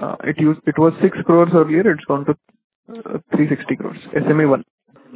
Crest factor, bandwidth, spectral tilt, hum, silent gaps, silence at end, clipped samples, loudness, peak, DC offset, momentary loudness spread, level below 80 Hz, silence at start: 16 dB; 4 kHz; -12 dB/octave; none; 2.64-2.83 s, 4.70-4.78 s; 0 s; under 0.1%; -17 LUFS; 0 dBFS; under 0.1%; 11 LU; -58 dBFS; 0 s